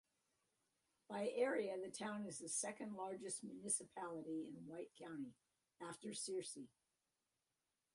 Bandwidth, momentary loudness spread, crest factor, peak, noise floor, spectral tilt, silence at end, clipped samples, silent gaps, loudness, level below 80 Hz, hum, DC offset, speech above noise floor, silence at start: 11.5 kHz; 13 LU; 22 dB; -28 dBFS; under -90 dBFS; -3 dB/octave; 1.3 s; under 0.1%; none; -47 LUFS; -90 dBFS; none; under 0.1%; over 43 dB; 1.1 s